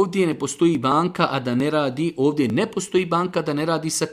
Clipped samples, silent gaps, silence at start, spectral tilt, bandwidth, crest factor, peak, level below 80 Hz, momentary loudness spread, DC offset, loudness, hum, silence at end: under 0.1%; none; 0 s; -5 dB/octave; 15.5 kHz; 18 dB; -4 dBFS; -60 dBFS; 3 LU; under 0.1%; -21 LUFS; none; 0 s